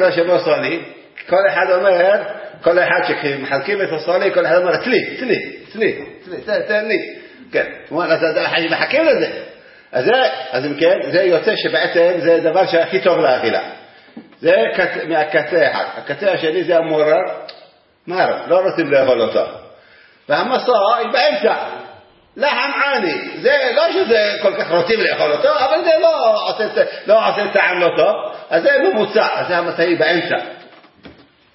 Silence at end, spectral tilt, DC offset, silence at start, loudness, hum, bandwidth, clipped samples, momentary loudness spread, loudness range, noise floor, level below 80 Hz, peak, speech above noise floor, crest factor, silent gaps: 0.45 s; -8 dB/octave; under 0.1%; 0 s; -16 LUFS; none; 5.8 kHz; under 0.1%; 8 LU; 3 LU; -47 dBFS; -64 dBFS; 0 dBFS; 32 dB; 16 dB; none